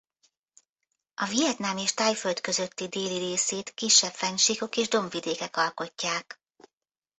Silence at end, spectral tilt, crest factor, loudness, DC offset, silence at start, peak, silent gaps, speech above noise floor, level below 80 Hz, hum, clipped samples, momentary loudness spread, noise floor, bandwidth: 0.85 s; -1.5 dB/octave; 22 dB; -26 LUFS; under 0.1%; 1.2 s; -8 dBFS; none; 60 dB; -72 dBFS; none; under 0.1%; 11 LU; -88 dBFS; 8.4 kHz